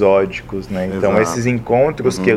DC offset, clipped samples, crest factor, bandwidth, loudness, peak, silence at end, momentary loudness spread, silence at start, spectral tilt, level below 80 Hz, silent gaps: under 0.1%; under 0.1%; 16 dB; 15 kHz; -17 LUFS; 0 dBFS; 0 s; 8 LU; 0 s; -6 dB/octave; -42 dBFS; none